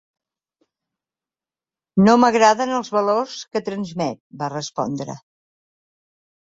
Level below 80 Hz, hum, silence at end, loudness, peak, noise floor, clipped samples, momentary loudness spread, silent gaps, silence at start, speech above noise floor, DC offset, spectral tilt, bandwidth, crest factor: -60 dBFS; none; 1.3 s; -20 LUFS; -2 dBFS; under -90 dBFS; under 0.1%; 15 LU; 4.20-4.30 s; 1.95 s; over 71 dB; under 0.1%; -5.5 dB/octave; 7.8 kHz; 20 dB